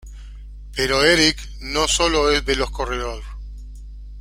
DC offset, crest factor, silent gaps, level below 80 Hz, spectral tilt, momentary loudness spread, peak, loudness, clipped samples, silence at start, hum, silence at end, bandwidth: under 0.1%; 20 dB; none; -32 dBFS; -2.5 dB/octave; 25 LU; -2 dBFS; -18 LUFS; under 0.1%; 0.05 s; 50 Hz at -30 dBFS; 0 s; 16.5 kHz